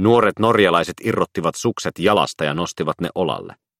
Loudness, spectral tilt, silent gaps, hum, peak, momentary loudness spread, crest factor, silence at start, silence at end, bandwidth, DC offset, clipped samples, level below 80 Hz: -19 LUFS; -5 dB/octave; none; none; -2 dBFS; 8 LU; 18 dB; 0 s; 0.3 s; 15.5 kHz; under 0.1%; under 0.1%; -54 dBFS